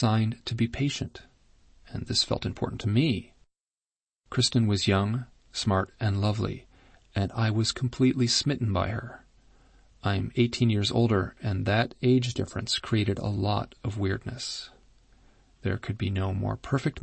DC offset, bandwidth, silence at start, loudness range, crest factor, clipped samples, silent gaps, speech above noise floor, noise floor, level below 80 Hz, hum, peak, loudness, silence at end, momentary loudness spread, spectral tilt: under 0.1%; 8.8 kHz; 0 s; 4 LU; 18 dB; under 0.1%; none; over 63 dB; under -90 dBFS; -50 dBFS; none; -10 dBFS; -28 LUFS; 0.05 s; 10 LU; -5.5 dB/octave